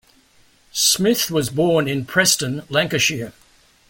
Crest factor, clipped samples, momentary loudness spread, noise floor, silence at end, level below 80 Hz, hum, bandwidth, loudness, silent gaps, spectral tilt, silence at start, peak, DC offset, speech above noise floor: 18 dB; under 0.1%; 7 LU; -55 dBFS; 0.6 s; -54 dBFS; none; 17 kHz; -18 LUFS; none; -3 dB/octave; 0.75 s; -2 dBFS; under 0.1%; 36 dB